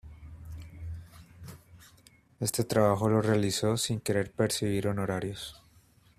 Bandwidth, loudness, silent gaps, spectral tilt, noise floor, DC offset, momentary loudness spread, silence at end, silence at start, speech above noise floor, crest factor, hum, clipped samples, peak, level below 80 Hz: 15.5 kHz; -29 LUFS; none; -5 dB/octave; -61 dBFS; under 0.1%; 23 LU; 0.65 s; 0.05 s; 33 dB; 20 dB; none; under 0.1%; -10 dBFS; -56 dBFS